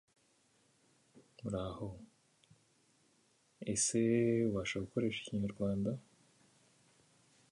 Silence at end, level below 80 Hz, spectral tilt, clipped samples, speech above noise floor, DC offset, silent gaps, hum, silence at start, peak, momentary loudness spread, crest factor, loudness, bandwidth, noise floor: 1.5 s; -64 dBFS; -5 dB/octave; under 0.1%; 37 dB; under 0.1%; none; none; 1.15 s; -20 dBFS; 16 LU; 20 dB; -36 LUFS; 11.5 kHz; -73 dBFS